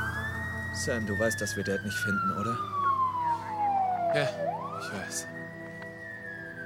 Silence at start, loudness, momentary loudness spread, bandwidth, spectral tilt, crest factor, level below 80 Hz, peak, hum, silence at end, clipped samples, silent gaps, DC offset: 0 s; -31 LUFS; 12 LU; 16.5 kHz; -4.5 dB/octave; 18 dB; -56 dBFS; -14 dBFS; none; 0 s; under 0.1%; none; under 0.1%